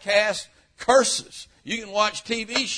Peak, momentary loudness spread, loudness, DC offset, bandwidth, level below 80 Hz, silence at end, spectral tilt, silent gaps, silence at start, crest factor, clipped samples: -4 dBFS; 19 LU; -23 LUFS; under 0.1%; 11 kHz; -58 dBFS; 0 s; -1.5 dB/octave; none; 0 s; 20 dB; under 0.1%